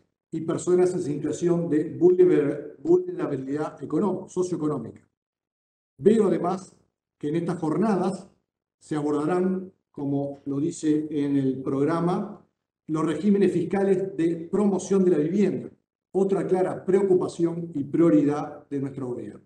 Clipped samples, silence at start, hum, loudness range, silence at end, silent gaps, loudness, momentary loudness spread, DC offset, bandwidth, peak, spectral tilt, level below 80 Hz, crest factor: under 0.1%; 0.35 s; none; 4 LU; 0.05 s; 5.17-5.33 s, 5.52-5.97 s, 8.74-8.78 s, 15.95-15.99 s; -25 LUFS; 11 LU; under 0.1%; 9.6 kHz; -6 dBFS; -7.5 dB/octave; -68 dBFS; 18 dB